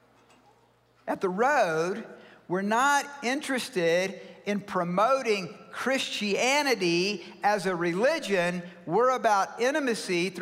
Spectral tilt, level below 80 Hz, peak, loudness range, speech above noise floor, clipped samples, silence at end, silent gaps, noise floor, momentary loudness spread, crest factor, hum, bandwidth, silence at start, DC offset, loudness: -4 dB/octave; -76 dBFS; -12 dBFS; 2 LU; 36 dB; under 0.1%; 0 s; none; -63 dBFS; 9 LU; 14 dB; none; 16 kHz; 1.05 s; under 0.1%; -27 LUFS